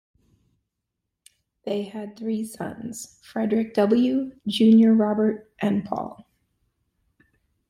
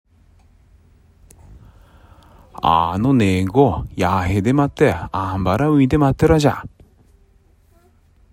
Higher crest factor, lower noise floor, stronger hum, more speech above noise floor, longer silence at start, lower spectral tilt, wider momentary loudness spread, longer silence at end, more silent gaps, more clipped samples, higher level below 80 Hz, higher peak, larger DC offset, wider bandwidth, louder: about the same, 16 dB vs 18 dB; first, -82 dBFS vs -54 dBFS; neither; first, 60 dB vs 38 dB; first, 1.65 s vs 1.5 s; about the same, -6.5 dB/octave vs -7.5 dB/octave; first, 18 LU vs 7 LU; about the same, 1.55 s vs 1.65 s; neither; neither; second, -66 dBFS vs -38 dBFS; second, -8 dBFS vs -2 dBFS; neither; second, 12.5 kHz vs 16 kHz; second, -23 LUFS vs -17 LUFS